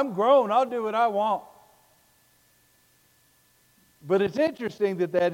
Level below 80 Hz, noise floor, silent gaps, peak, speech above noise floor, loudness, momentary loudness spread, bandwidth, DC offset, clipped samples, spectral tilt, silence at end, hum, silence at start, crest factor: -72 dBFS; -63 dBFS; none; -10 dBFS; 39 dB; -24 LUFS; 8 LU; 17 kHz; under 0.1%; under 0.1%; -6.5 dB/octave; 0 s; none; 0 s; 18 dB